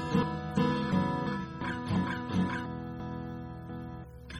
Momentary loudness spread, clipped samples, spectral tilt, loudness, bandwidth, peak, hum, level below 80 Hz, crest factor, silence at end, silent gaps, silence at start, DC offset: 12 LU; under 0.1%; -7.5 dB/octave; -33 LUFS; 12 kHz; -16 dBFS; none; -52 dBFS; 16 dB; 0 s; none; 0 s; under 0.1%